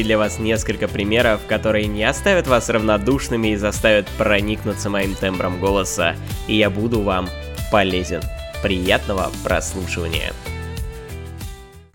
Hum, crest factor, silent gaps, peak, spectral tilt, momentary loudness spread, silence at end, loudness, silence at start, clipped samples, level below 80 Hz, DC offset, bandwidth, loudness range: none; 20 dB; none; 0 dBFS; -4.5 dB/octave; 13 LU; 0.1 s; -19 LUFS; 0 s; under 0.1%; -32 dBFS; under 0.1%; 18.5 kHz; 5 LU